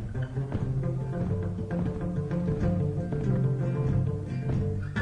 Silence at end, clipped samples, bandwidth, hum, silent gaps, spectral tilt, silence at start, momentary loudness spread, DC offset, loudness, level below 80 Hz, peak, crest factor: 0 s; under 0.1%; 7 kHz; none; none; -9.5 dB/octave; 0 s; 5 LU; under 0.1%; -30 LUFS; -42 dBFS; -16 dBFS; 12 dB